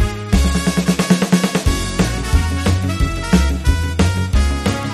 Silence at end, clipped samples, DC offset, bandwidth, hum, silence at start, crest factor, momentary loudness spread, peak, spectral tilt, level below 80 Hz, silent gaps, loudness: 0 s; under 0.1%; under 0.1%; 13.5 kHz; none; 0 s; 16 dB; 3 LU; 0 dBFS; -5.5 dB/octave; -20 dBFS; none; -17 LUFS